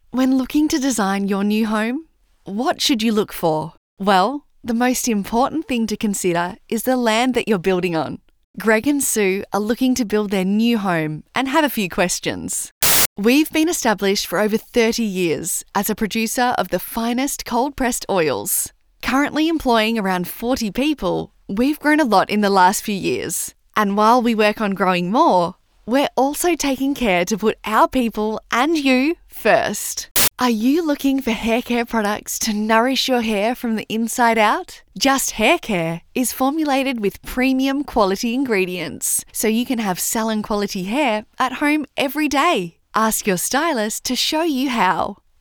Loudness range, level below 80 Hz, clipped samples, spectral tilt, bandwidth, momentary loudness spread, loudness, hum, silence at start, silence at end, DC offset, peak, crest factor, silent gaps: 3 LU; -46 dBFS; under 0.1%; -3.5 dB/octave; over 20 kHz; 7 LU; -19 LUFS; none; 0.15 s; 0.25 s; under 0.1%; -4 dBFS; 16 dB; 3.77-3.97 s, 8.44-8.54 s, 12.71-12.81 s, 13.06-13.16 s, 30.11-30.15 s